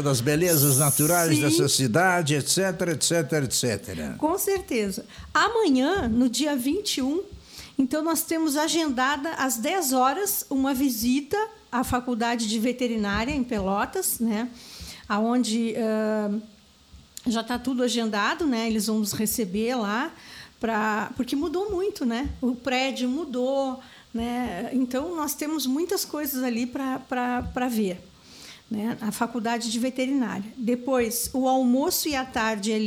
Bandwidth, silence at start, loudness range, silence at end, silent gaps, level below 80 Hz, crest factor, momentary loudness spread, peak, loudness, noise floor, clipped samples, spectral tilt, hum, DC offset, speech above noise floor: 19 kHz; 0 s; 5 LU; 0 s; none; -50 dBFS; 16 dB; 9 LU; -8 dBFS; -25 LUFS; -52 dBFS; under 0.1%; -4 dB/octave; none; under 0.1%; 27 dB